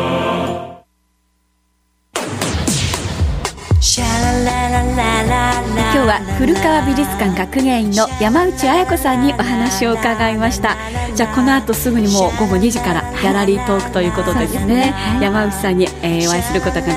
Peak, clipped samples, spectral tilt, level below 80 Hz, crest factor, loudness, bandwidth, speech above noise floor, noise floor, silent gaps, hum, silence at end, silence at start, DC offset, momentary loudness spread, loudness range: 0 dBFS; under 0.1%; -4.5 dB/octave; -28 dBFS; 14 dB; -15 LUFS; 16 kHz; 47 dB; -61 dBFS; none; none; 0 s; 0 s; under 0.1%; 5 LU; 3 LU